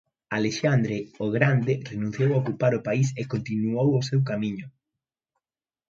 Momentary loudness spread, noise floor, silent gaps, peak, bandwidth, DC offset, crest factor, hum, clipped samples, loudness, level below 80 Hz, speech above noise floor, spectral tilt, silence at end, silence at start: 8 LU; under -90 dBFS; none; -6 dBFS; 7.6 kHz; under 0.1%; 20 dB; none; under 0.1%; -25 LUFS; -62 dBFS; over 66 dB; -7 dB/octave; 1.2 s; 0.3 s